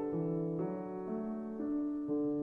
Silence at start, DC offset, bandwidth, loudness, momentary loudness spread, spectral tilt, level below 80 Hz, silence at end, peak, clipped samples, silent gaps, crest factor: 0 s; under 0.1%; 2.7 kHz; -38 LUFS; 5 LU; -12 dB/octave; -70 dBFS; 0 s; -26 dBFS; under 0.1%; none; 10 dB